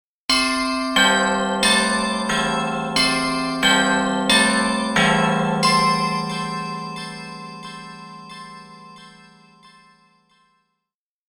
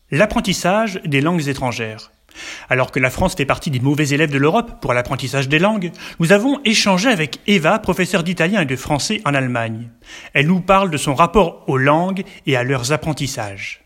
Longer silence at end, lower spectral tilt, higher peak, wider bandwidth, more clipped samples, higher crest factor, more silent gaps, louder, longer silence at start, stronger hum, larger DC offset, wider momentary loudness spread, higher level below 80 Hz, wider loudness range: first, 2.2 s vs 0.1 s; second, -3 dB/octave vs -5 dB/octave; about the same, -2 dBFS vs 0 dBFS; first, 18.5 kHz vs 16.5 kHz; neither; about the same, 18 dB vs 16 dB; neither; about the same, -18 LUFS vs -17 LUFS; first, 0.3 s vs 0.1 s; neither; neither; first, 19 LU vs 10 LU; second, -50 dBFS vs -40 dBFS; first, 18 LU vs 3 LU